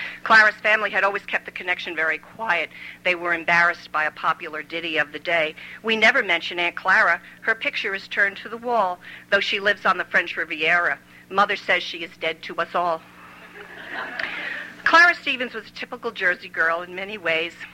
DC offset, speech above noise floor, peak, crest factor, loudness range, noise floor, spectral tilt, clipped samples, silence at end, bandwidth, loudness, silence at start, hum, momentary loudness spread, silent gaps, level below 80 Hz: under 0.1%; 20 dB; -4 dBFS; 20 dB; 3 LU; -43 dBFS; -3 dB/octave; under 0.1%; 0 s; 16 kHz; -21 LUFS; 0 s; 60 Hz at -65 dBFS; 14 LU; none; -64 dBFS